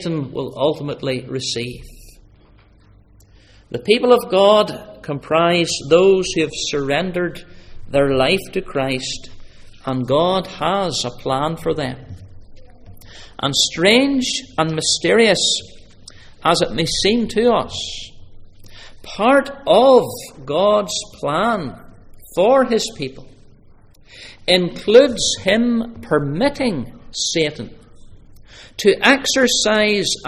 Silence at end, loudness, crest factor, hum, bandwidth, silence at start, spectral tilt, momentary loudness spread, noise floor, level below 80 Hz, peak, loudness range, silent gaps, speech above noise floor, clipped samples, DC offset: 0 s; -17 LUFS; 18 dB; none; 16 kHz; 0 s; -3.5 dB/octave; 15 LU; -49 dBFS; -44 dBFS; 0 dBFS; 5 LU; none; 32 dB; under 0.1%; under 0.1%